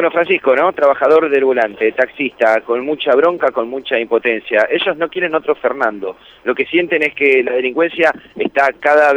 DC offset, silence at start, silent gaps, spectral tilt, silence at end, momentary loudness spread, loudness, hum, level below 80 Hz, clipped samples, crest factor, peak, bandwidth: under 0.1%; 0 s; none; -5 dB/octave; 0 s; 7 LU; -15 LUFS; none; -60 dBFS; under 0.1%; 14 dB; 0 dBFS; 8.6 kHz